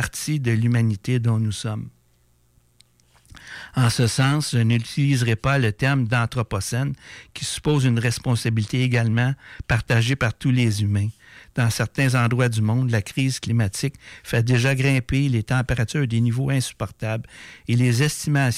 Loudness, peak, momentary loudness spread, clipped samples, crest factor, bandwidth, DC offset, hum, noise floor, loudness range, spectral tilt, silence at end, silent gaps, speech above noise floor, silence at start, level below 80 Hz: -22 LUFS; -10 dBFS; 10 LU; under 0.1%; 12 dB; 15 kHz; under 0.1%; none; -60 dBFS; 4 LU; -5.5 dB/octave; 0 s; none; 39 dB; 0 s; -44 dBFS